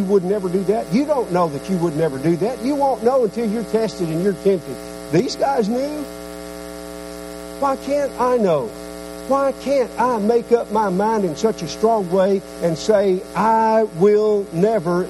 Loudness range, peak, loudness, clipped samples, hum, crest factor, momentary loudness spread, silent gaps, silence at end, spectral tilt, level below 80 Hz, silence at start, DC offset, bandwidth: 5 LU; -2 dBFS; -19 LUFS; under 0.1%; none; 16 dB; 15 LU; none; 0 s; -6.5 dB/octave; -48 dBFS; 0 s; under 0.1%; 15 kHz